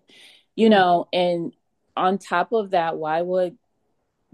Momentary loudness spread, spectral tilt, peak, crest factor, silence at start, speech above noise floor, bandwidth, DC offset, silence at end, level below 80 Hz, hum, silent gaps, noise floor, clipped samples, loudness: 12 LU; -6 dB/octave; -4 dBFS; 18 dB; 0.55 s; 52 dB; 11 kHz; under 0.1%; 0.85 s; -72 dBFS; none; none; -73 dBFS; under 0.1%; -21 LUFS